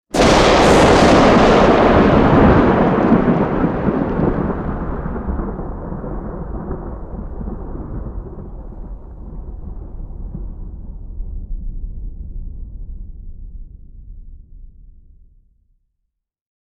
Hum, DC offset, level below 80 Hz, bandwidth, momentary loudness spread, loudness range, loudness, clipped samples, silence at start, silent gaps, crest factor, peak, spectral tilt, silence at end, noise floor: none; under 0.1%; -28 dBFS; 13 kHz; 25 LU; 23 LU; -13 LUFS; under 0.1%; 0.15 s; none; 16 dB; 0 dBFS; -6 dB/octave; 1.85 s; -74 dBFS